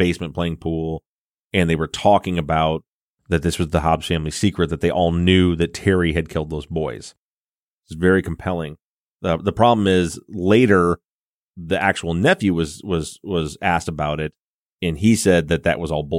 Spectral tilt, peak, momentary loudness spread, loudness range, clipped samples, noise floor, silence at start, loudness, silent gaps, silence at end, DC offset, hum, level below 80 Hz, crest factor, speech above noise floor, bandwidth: -6 dB/octave; -2 dBFS; 10 LU; 3 LU; under 0.1%; under -90 dBFS; 0 s; -20 LUFS; 1.06-1.50 s, 2.88-3.16 s, 7.18-7.81 s, 8.84-9.19 s, 11.04-11.52 s, 14.42-14.77 s; 0 s; under 0.1%; none; -38 dBFS; 18 dB; over 71 dB; 15.5 kHz